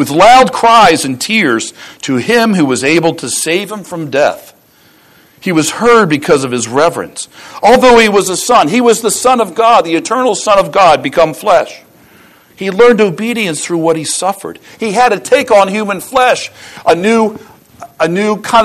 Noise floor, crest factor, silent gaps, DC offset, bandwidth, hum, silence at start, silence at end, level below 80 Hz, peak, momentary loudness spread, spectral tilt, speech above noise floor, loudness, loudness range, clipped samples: -46 dBFS; 10 dB; none; under 0.1%; 14 kHz; none; 0 s; 0 s; -44 dBFS; 0 dBFS; 12 LU; -3.5 dB/octave; 36 dB; -10 LUFS; 4 LU; 0.3%